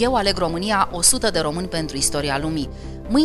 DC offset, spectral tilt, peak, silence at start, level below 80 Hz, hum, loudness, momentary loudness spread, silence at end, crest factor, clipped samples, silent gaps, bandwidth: under 0.1%; -3 dB/octave; -2 dBFS; 0 s; -36 dBFS; none; -20 LUFS; 10 LU; 0 s; 18 dB; under 0.1%; none; 13.5 kHz